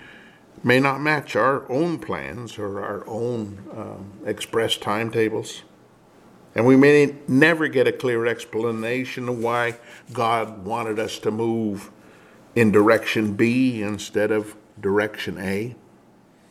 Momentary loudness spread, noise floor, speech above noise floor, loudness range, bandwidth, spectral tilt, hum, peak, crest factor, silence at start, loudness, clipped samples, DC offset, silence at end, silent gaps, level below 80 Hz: 15 LU; -53 dBFS; 32 dB; 7 LU; 15 kHz; -5.5 dB/octave; none; -2 dBFS; 20 dB; 0.05 s; -22 LUFS; under 0.1%; under 0.1%; 0.75 s; none; -62 dBFS